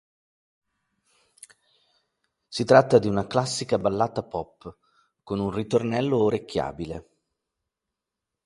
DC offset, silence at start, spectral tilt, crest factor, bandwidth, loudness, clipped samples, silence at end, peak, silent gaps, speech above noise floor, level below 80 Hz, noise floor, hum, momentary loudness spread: under 0.1%; 2.5 s; -5.5 dB/octave; 24 dB; 11.5 kHz; -24 LUFS; under 0.1%; 1.45 s; -2 dBFS; none; 62 dB; -56 dBFS; -86 dBFS; none; 17 LU